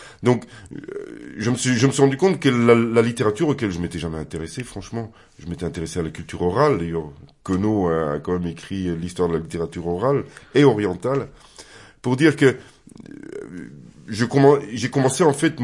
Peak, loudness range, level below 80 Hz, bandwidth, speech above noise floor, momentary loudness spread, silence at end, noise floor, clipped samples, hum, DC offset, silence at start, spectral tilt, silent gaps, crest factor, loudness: -2 dBFS; 6 LU; -52 dBFS; 11.5 kHz; 24 dB; 19 LU; 0 s; -45 dBFS; under 0.1%; none; under 0.1%; 0 s; -6 dB/octave; none; 20 dB; -21 LUFS